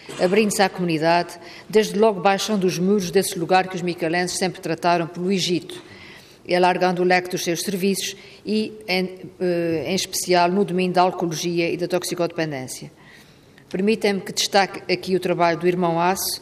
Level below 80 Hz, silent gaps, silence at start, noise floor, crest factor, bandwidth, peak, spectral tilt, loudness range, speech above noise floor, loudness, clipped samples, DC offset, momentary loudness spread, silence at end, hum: -62 dBFS; none; 0 s; -49 dBFS; 16 dB; 15.5 kHz; -4 dBFS; -4.5 dB/octave; 3 LU; 28 dB; -21 LUFS; under 0.1%; under 0.1%; 9 LU; 0 s; none